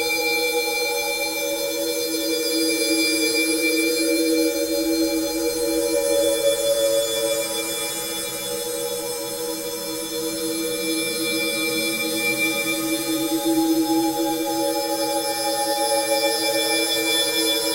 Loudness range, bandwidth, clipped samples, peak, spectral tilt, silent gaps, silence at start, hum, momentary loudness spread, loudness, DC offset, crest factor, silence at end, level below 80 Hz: 4 LU; 16 kHz; under 0.1%; -8 dBFS; -1.5 dB/octave; none; 0 s; none; 7 LU; -21 LUFS; under 0.1%; 14 dB; 0 s; -56 dBFS